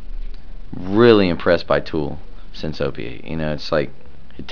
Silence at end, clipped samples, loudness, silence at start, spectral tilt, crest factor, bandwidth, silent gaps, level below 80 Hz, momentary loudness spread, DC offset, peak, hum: 0 s; under 0.1%; -19 LUFS; 0 s; -7.5 dB/octave; 20 dB; 5.4 kHz; none; -34 dBFS; 25 LU; 5%; 0 dBFS; none